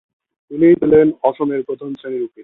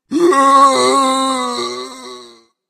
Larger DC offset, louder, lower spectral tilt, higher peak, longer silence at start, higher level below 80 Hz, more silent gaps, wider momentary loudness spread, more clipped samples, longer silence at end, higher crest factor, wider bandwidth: neither; second, -15 LUFS vs -12 LUFS; first, -11 dB/octave vs -2 dB/octave; about the same, -2 dBFS vs 0 dBFS; first, 0.5 s vs 0.1 s; first, -52 dBFS vs -60 dBFS; neither; second, 15 LU vs 20 LU; neither; second, 0 s vs 0.45 s; about the same, 14 dB vs 14 dB; second, 4 kHz vs 14.5 kHz